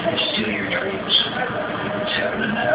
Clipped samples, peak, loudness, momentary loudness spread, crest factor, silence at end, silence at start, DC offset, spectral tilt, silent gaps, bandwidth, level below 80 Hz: under 0.1%; -6 dBFS; -20 LUFS; 7 LU; 16 dB; 0 s; 0 s; under 0.1%; -8 dB/octave; none; 4 kHz; -50 dBFS